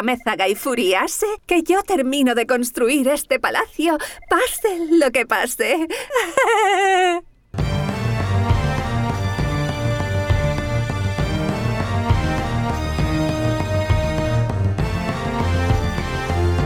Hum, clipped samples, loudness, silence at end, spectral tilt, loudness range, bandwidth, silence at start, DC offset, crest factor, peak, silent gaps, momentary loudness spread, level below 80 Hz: none; under 0.1%; -20 LUFS; 0 s; -5.5 dB/octave; 3 LU; 18 kHz; 0 s; under 0.1%; 14 dB; -4 dBFS; none; 6 LU; -32 dBFS